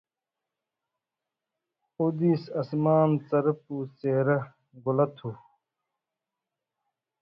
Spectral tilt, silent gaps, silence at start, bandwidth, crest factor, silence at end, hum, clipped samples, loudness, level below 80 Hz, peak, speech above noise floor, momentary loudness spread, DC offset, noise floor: -11 dB/octave; none; 2 s; 5.6 kHz; 20 dB; 1.85 s; none; under 0.1%; -27 LUFS; -72 dBFS; -10 dBFS; 63 dB; 13 LU; under 0.1%; -89 dBFS